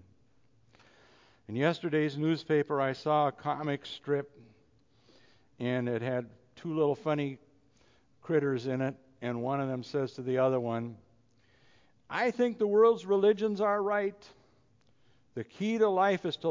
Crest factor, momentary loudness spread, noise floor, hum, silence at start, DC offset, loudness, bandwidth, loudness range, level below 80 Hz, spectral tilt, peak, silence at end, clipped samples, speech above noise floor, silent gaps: 18 dB; 12 LU; -69 dBFS; none; 1.5 s; under 0.1%; -30 LUFS; 7.6 kHz; 6 LU; -74 dBFS; -7 dB/octave; -14 dBFS; 0 s; under 0.1%; 39 dB; none